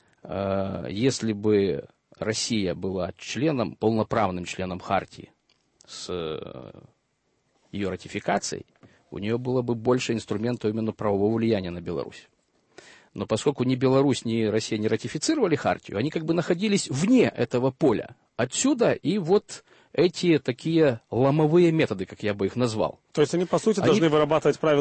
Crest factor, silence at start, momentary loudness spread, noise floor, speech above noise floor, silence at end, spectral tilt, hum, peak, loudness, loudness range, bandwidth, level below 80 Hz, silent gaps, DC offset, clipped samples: 16 dB; 0.25 s; 12 LU; -72 dBFS; 48 dB; 0 s; -5.5 dB/octave; none; -8 dBFS; -25 LUFS; 9 LU; 8.8 kHz; -58 dBFS; none; under 0.1%; under 0.1%